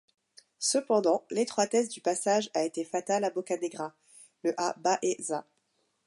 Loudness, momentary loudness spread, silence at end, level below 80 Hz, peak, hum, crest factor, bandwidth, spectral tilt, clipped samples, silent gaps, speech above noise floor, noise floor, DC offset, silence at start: -30 LUFS; 8 LU; 0.65 s; -84 dBFS; -14 dBFS; none; 18 dB; 11.5 kHz; -3 dB/octave; under 0.1%; none; 46 dB; -75 dBFS; under 0.1%; 0.6 s